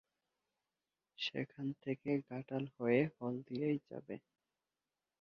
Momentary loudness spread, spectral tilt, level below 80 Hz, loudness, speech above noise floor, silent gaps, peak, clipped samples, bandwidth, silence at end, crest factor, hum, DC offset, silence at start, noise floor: 13 LU; -5 dB/octave; -80 dBFS; -40 LUFS; over 51 dB; none; -20 dBFS; under 0.1%; 6.8 kHz; 1.05 s; 22 dB; none; under 0.1%; 1.2 s; under -90 dBFS